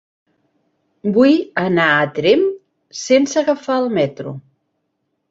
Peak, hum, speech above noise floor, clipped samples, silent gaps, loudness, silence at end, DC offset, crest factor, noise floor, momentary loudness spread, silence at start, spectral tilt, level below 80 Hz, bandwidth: -2 dBFS; none; 56 dB; under 0.1%; none; -16 LUFS; 0.9 s; under 0.1%; 16 dB; -71 dBFS; 17 LU; 1.05 s; -5 dB/octave; -62 dBFS; 7.8 kHz